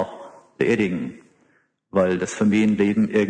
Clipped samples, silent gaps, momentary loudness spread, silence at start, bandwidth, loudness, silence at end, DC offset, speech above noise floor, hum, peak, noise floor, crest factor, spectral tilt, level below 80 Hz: under 0.1%; none; 12 LU; 0 s; 9.4 kHz; -21 LUFS; 0 s; under 0.1%; 43 dB; none; -6 dBFS; -63 dBFS; 16 dB; -6.5 dB/octave; -58 dBFS